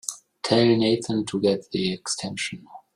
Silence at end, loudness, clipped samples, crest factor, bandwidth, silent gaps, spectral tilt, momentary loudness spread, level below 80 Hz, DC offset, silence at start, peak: 0.15 s; -24 LUFS; under 0.1%; 20 dB; 15.5 kHz; none; -4.5 dB/octave; 13 LU; -60 dBFS; under 0.1%; 0.05 s; -6 dBFS